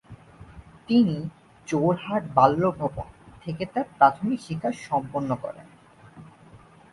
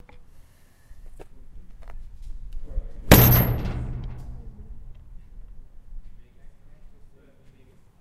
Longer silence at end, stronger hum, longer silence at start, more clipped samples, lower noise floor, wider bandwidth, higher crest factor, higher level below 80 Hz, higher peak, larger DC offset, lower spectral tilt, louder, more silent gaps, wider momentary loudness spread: second, 0.35 s vs 0.95 s; neither; about the same, 0.1 s vs 0.15 s; neither; about the same, -51 dBFS vs -52 dBFS; second, 11.5 kHz vs 16 kHz; about the same, 24 dB vs 26 dB; second, -54 dBFS vs -34 dBFS; about the same, -2 dBFS vs 0 dBFS; neither; first, -7.5 dB/octave vs -5.5 dB/octave; second, -24 LUFS vs -18 LUFS; neither; second, 19 LU vs 31 LU